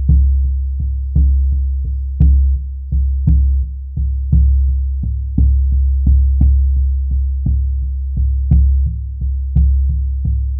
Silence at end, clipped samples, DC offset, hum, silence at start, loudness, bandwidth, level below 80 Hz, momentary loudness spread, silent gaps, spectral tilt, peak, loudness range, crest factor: 0 s; under 0.1%; under 0.1%; none; 0 s; -16 LUFS; 0.8 kHz; -14 dBFS; 8 LU; none; -14.5 dB/octave; 0 dBFS; 2 LU; 12 dB